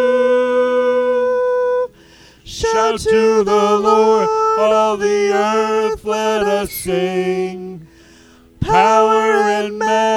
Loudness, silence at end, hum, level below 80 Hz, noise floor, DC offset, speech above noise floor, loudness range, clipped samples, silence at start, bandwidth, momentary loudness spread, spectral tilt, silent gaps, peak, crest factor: -15 LUFS; 0 s; 60 Hz at -55 dBFS; -44 dBFS; -45 dBFS; under 0.1%; 31 dB; 4 LU; under 0.1%; 0 s; 15.5 kHz; 8 LU; -4.5 dB/octave; none; -2 dBFS; 14 dB